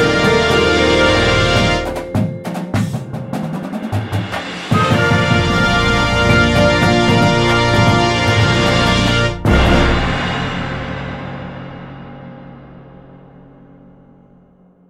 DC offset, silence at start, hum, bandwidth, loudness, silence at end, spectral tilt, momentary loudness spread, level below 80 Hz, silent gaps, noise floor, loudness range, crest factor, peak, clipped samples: under 0.1%; 0 s; none; 14 kHz; -14 LUFS; 2 s; -5.5 dB/octave; 14 LU; -26 dBFS; none; -48 dBFS; 13 LU; 14 dB; 0 dBFS; under 0.1%